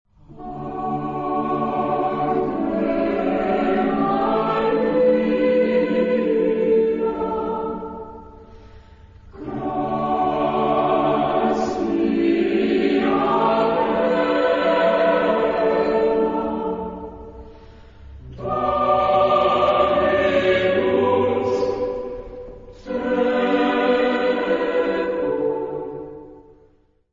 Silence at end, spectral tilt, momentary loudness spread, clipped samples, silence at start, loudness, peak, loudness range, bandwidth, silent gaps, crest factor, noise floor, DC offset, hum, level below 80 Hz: 0.75 s; -7 dB/octave; 14 LU; under 0.1%; 0.3 s; -20 LUFS; -6 dBFS; 5 LU; 7.6 kHz; none; 14 dB; -57 dBFS; under 0.1%; none; -46 dBFS